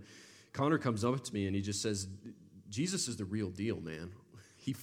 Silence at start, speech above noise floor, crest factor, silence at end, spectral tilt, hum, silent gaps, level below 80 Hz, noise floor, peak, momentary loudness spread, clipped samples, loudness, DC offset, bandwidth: 0 s; 22 dB; 20 dB; 0 s; -5 dB/octave; none; none; -70 dBFS; -58 dBFS; -18 dBFS; 20 LU; under 0.1%; -36 LUFS; under 0.1%; 16 kHz